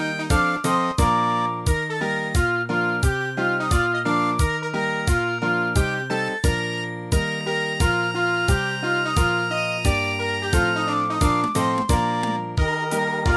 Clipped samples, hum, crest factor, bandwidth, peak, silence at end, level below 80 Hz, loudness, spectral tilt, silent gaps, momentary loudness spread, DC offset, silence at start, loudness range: under 0.1%; none; 16 dB; 11 kHz; -6 dBFS; 0 s; -30 dBFS; -22 LUFS; -5 dB/octave; none; 4 LU; under 0.1%; 0 s; 1 LU